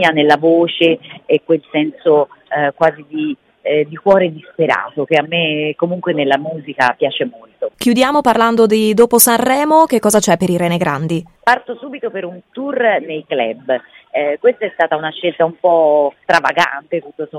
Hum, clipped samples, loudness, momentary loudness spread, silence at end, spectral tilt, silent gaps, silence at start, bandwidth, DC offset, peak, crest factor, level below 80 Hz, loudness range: none; under 0.1%; -14 LUFS; 11 LU; 0 s; -4 dB/octave; none; 0 s; 17 kHz; under 0.1%; 0 dBFS; 14 dB; -56 dBFS; 6 LU